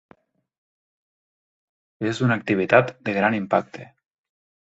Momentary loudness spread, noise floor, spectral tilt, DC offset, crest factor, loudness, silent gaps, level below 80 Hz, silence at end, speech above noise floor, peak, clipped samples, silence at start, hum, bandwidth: 12 LU; under -90 dBFS; -7 dB/octave; under 0.1%; 24 dB; -21 LUFS; none; -62 dBFS; 0.85 s; over 69 dB; -2 dBFS; under 0.1%; 2 s; none; 8 kHz